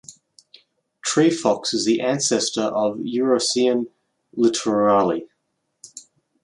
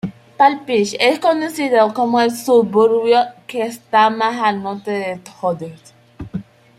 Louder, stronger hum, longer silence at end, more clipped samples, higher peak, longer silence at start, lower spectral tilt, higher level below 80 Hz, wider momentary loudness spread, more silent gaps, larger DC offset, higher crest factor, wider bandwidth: second, -20 LUFS vs -16 LUFS; neither; about the same, 0.45 s vs 0.35 s; neither; about the same, -2 dBFS vs -2 dBFS; about the same, 0.1 s vs 0.05 s; about the same, -3.5 dB/octave vs -4.5 dB/octave; second, -66 dBFS vs -56 dBFS; second, 13 LU vs 16 LU; neither; neither; about the same, 18 dB vs 16 dB; second, 11.5 kHz vs 15.5 kHz